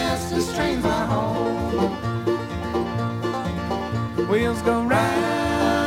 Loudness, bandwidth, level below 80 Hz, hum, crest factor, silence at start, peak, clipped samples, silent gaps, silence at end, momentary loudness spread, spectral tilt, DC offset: -23 LUFS; 16.5 kHz; -40 dBFS; none; 16 dB; 0 s; -6 dBFS; under 0.1%; none; 0 s; 6 LU; -6 dB/octave; under 0.1%